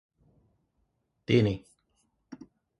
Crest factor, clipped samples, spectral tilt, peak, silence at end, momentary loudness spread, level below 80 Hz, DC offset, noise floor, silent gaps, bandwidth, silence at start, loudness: 24 dB; under 0.1%; -7.5 dB/octave; -10 dBFS; 0.45 s; 25 LU; -58 dBFS; under 0.1%; -76 dBFS; none; 11 kHz; 1.3 s; -27 LUFS